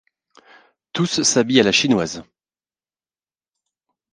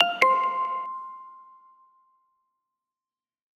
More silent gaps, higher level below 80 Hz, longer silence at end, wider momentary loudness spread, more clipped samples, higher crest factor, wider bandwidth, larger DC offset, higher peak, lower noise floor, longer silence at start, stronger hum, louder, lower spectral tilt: neither; first, -58 dBFS vs under -90 dBFS; second, 1.9 s vs 2.15 s; second, 14 LU vs 24 LU; neither; about the same, 22 dB vs 26 dB; second, 10 kHz vs 13.5 kHz; neither; about the same, 0 dBFS vs -2 dBFS; about the same, under -90 dBFS vs under -90 dBFS; first, 0.95 s vs 0 s; neither; first, -17 LUFS vs -24 LUFS; first, -3.5 dB/octave vs -2 dB/octave